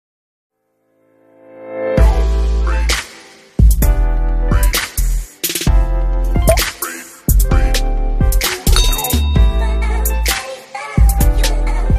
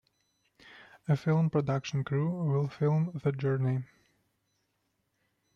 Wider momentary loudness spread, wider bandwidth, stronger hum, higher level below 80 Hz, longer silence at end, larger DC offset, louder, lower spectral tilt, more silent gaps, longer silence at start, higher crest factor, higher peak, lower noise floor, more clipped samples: first, 8 LU vs 5 LU; first, 15 kHz vs 6.8 kHz; neither; first, -14 dBFS vs -68 dBFS; second, 0 s vs 1.7 s; neither; first, -16 LUFS vs -30 LUFS; second, -4.5 dB/octave vs -8.5 dB/octave; neither; first, 1.55 s vs 0.65 s; about the same, 14 dB vs 16 dB; first, 0 dBFS vs -16 dBFS; second, -62 dBFS vs -78 dBFS; neither